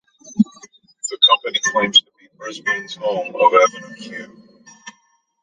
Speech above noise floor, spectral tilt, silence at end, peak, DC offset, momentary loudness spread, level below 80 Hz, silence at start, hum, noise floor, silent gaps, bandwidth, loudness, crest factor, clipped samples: 42 dB; -2.5 dB/octave; 0.5 s; -2 dBFS; under 0.1%; 20 LU; -66 dBFS; 0.3 s; none; -61 dBFS; none; 9.4 kHz; -16 LUFS; 18 dB; under 0.1%